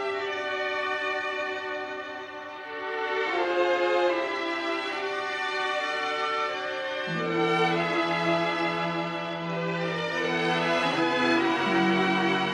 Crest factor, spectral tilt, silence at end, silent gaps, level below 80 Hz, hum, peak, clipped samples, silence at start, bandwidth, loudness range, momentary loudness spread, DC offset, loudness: 16 dB; -5 dB/octave; 0 s; none; -72 dBFS; none; -12 dBFS; under 0.1%; 0 s; 11 kHz; 3 LU; 8 LU; under 0.1%; -27 LUFS